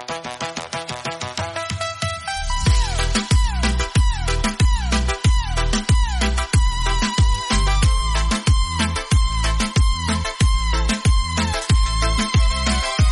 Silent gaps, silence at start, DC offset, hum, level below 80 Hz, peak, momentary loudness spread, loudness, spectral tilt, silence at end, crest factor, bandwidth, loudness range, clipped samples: none; 0 s; under 0.1%; none; -20 dBFS; -6 dBFS; 7 LU; -20 LUFS; -4 dB/octave; 0 s; 12 dB; 11.5 kHz; 2 LU; under 0.1%